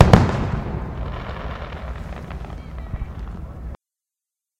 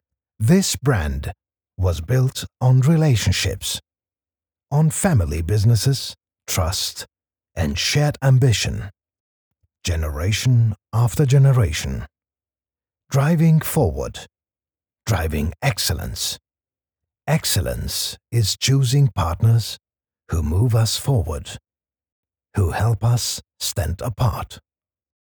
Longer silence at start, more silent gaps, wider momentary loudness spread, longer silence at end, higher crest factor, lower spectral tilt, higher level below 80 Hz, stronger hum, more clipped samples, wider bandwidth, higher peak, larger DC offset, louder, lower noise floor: second, 0 s vs 0.4 s; second, none vs 9.20-9.51 s, 22.12-22.23 s; about the same, 14 LU vs 15 LU; first, 0.85 s vs 0.7 s; first, 22 dB vs 16 dB; first, -7.5 dB/octave vs -5 dB/octave; first, -30 dBFS vs -36 dBFS; neither; neither; second, 13 kHz vs over 20 kHz; first, 0 dBFS vs -4 dBFS; neither; second, -25 LUFS vs -20 LUFS; about the same, -87 dBFS vs under -90 dBFS